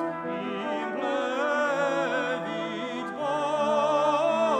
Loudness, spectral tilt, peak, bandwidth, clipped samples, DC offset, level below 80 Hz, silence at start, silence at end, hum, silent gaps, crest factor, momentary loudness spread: -27 LUFS; -4.5 dB/octave; -12 dBFS; 9.4 kHz; under 0.1%; under 0.1%; -76 dBFS; 0 s; 0 s; none; none; 14 dB; 8 LU